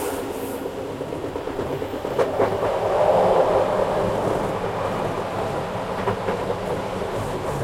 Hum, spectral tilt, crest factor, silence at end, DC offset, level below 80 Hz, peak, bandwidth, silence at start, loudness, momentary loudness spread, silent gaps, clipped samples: none; -6 dB/octave; 18 dB; 0 s; under 0.1%; -44 dBFS; -6 dBFS; 16.5 kHz; 0 s; -24 LUFS; 11 LU; none; under 0.1%